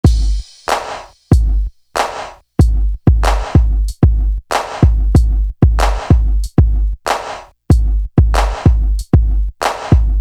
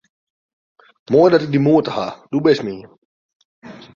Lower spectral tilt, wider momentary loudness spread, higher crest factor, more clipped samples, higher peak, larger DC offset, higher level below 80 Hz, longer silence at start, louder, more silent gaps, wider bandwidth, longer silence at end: about the same, -6.5 dB/octave vs -7.5 dB/octave; second, 7 LU vs 13 LU; second, 12 dB vs 18 dB; neither; about the same, 0 dBFS vs -2 dBFS; neither; first, -14 dBFS vs -58 dBFS; second, 0.05 s vs 1.1 s; about the same, -15 LUFS vs -16 LUFS; second, none vs 2.98-3.29 s, 3.35-3.62 s; first, 12.5 kHz vs 7.2 kHz; about the same, 0 s vs 0.1 s